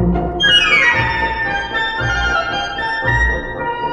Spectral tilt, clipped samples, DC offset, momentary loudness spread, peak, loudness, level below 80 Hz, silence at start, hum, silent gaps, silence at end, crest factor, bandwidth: -4 dB/octave; under 0.1%; under 0.1%; 10 LU; 0 dBFS; -15 LUFS; -28 dBFS; 0 s; none; none; 0 s; 16 dB; 10 kHz